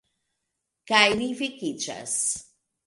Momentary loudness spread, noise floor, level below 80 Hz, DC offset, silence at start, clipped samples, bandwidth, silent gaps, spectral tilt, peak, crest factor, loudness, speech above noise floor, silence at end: 12 LU; -81 dBFS; -62 dBFS; under 0.1%; 0.85 s; under 0.1%; 11.5 kHz; none; -1.5 dB/octave; -4 dBFS; 24 dB; -24 LUFS; 56 dB; 0.45 s